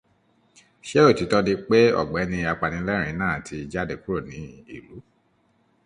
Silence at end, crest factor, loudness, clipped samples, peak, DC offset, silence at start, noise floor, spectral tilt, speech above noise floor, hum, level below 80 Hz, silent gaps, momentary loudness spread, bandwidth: 0.85 s; 20 dB; -22 LUFS; under 0.1%; -4 dBFS; under 0.1%; 0.85 s; -65 dBFS; -6 dB/octave; 42 dB; none; -48 dBFS; none; 22 LU; 11 kHz